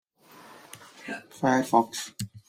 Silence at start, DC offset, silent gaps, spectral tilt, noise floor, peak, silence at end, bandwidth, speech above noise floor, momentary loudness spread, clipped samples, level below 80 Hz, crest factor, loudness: 0.5 s; under 0.1%; none; -4.5 dB/octave; -53 dBFS; -6 dBFS; 0.1 s; 16 kHz; 26 dB; 24 LU; under 0.1%; -68 dBFS; 22 dB; -27 LUFS